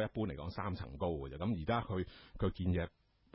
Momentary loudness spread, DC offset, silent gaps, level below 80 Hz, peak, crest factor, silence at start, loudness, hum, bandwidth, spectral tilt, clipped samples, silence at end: 6 LU; under 0.1%; none; -50 dBFS; -22 dBFS; 16 dB; 0 s; -39 LUFS; none; 5.6 kHz; -6.5 dB/octave; under 0.1%; 0.45 s